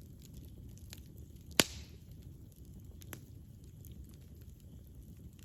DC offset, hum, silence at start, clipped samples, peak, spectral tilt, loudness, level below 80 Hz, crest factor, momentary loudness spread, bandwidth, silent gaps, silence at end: under 0.1%; none; 0 s; under 0.1%; -4 dBFS; -2.5 dB/octave; -37 LUFS; -56 dBFS; 40 dB; 23 LU; 17 kHz; none; 0 s